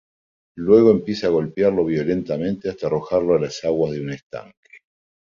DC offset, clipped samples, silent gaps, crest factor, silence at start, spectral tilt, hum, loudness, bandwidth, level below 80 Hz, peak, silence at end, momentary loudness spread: under 0.1%; under 0.1%; 4.23-4.30 s; 18 dB; 0.55 s; -7 dB/octave; none; -20 LUFS; 7.4 kHz; -52 dBFS; -2 dBFS; 0.8 s; 15 LU